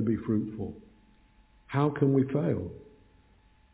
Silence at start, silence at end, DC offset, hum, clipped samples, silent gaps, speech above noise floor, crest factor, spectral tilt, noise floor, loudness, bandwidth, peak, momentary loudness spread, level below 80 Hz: 0 s; 0.9 s; under 0.1%; none; under 0.1%; none; 33 dB; 18 dB; -9 dB/octave; -61 dBFS; -29 LUFS; 4 kHz; -12 dBFS; 17 LU; -56 dBFS